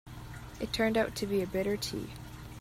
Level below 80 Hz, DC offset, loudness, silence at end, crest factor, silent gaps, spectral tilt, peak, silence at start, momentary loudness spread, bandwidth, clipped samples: -52 dBFS; under 0.1%; -32 LUFS; 0 s; 18 dB; none; -5 dB/octave; -16 dBFS; 0.05 s; 17 LU; 16 kHz; under 0.1%